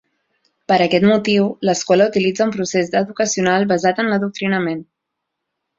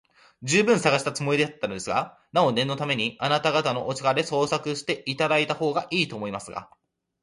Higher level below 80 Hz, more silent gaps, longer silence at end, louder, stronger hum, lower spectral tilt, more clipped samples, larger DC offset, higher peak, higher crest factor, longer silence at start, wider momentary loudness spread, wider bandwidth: about the same, -60 dBFS vs -64 dBFS; neither; first, 0.95 s vs 0.6 s; first, -17 LUFS vs -24 LUFS; neither; about the same, -4.5 dB/octave vs -4 dB/octave; neither; neither; first, -2 dBFS vs -6 dBFS; about the same, 16 dB vs 20 dB; first, 0.7 s vs 0.4 s; second, 6 LU vs 9 LU; second, 7.8 kHz vs 11.5 kHz